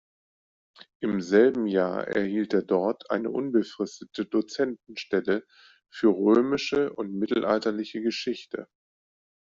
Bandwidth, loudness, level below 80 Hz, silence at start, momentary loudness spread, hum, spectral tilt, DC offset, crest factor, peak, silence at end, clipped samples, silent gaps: 7.6 kHz; -26 LUFS; -68 dBFS; 1 s; 12 LU; none; -6 dB/octave; under 0.1%; 18 dB; -8 dBFS; 0.85 s; under 0.1%; none